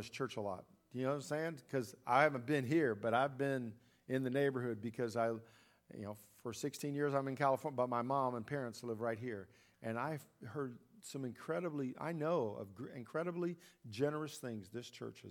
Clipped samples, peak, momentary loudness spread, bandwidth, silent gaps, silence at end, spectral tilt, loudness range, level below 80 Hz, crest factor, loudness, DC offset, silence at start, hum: under 0.1%; -16 dBFS; 14 LU; 18 kHz; none; 0 s; -6 dB/octave; 6 LU; -82 dBFS; 24 dB; -40 LUFS; under 0.1%; 0 s; none